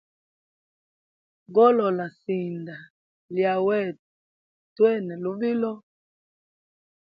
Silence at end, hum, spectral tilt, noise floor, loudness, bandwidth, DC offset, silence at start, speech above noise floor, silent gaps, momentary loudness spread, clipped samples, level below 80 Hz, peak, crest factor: 1.4 s; none; -9.5 dB/octave; under -90 dBFS; -24 LUFS; 5 kHz; under 0.1%; 1.5 s; over 67 dB; 2.90-3.29 s, 3.99-4.76 s; 15 LU; under 0.1%; -78 dBFS; -8 dBFS; 20 dB